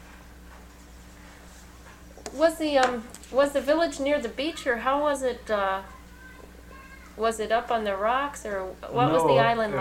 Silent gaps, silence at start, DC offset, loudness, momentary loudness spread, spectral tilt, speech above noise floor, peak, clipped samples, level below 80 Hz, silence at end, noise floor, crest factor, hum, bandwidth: none; 0 s; under 0.1%; -25 LUFS; 24 LU; -4.5 dB/octave; 22 dB; -6 dBFS; under 0.1%; -50 dBFS; 0 s; -47 dBFS; 20 dB; none; 16.5 kHz